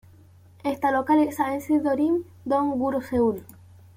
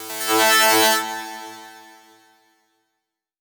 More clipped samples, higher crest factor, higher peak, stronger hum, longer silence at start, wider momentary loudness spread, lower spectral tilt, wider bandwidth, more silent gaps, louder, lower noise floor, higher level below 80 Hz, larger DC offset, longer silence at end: neither; second, 16 dB vs 22 dB; second, -10 dBFS vs 0 dBFS; second, none vs 50 Hz at -90 dBFS; first, 0.65 s vs 0 s; second, 7 LU vs 23 LU; first, -6.5 dB/octave vs 0 dB/octave; second, 16 kHz vs over 20 kHz; neither; second, -24 LUFS vs -16 LUFS; second, -52 dBFS vs -80 dBFS; first, -58 dBFS vs -80 dBFS; neither; second, 0.55 s vs 1.6 s